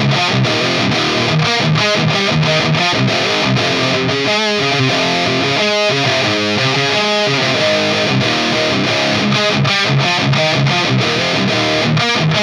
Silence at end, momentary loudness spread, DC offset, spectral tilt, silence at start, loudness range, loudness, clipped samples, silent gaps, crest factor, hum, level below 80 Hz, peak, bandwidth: 0 s; 1 LU; under 0.1%; -4.5 dB/octave; 0 s; 0 LU; -13 LUFS; under 0.1%; none; 14 dB; none; -48 dBFS; 0 dBFS; 12.5 kHz